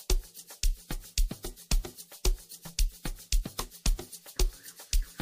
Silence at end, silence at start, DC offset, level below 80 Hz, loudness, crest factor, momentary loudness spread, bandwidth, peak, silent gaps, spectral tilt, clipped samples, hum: 0 s; 0 s; under 0.1%; -32 dBFS; -35 LUFS; 20 dB; 7 LU; 16 kHz; -12 dBFS; none; -3 dB/octave; under 0.1%; none